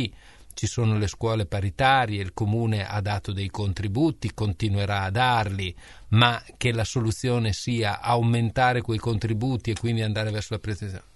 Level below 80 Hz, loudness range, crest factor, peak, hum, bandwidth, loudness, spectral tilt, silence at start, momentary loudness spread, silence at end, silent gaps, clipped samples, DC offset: -46 dBFS; 2 LU; 22 dB; -2 dBFS; none; 11.5 kHz; -25 LUFS; -5.5 dB/octave; 0 s; 9 LU; 0.15 s; none; under 0.1%; 0.2%